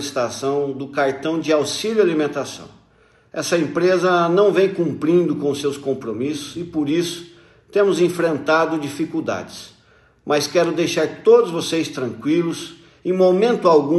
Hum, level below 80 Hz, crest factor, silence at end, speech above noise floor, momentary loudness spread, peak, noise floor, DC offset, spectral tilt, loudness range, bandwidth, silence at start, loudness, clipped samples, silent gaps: none; -62 dBFS; 18 dB; 0 s; 36 dB; 12 LU; -2 dBFS; -55 dBFS; under 0.1%; -5 dB/octave; 3 LU; 12.5 kHz; 0 s; -19 LUFS; under 0.1%; none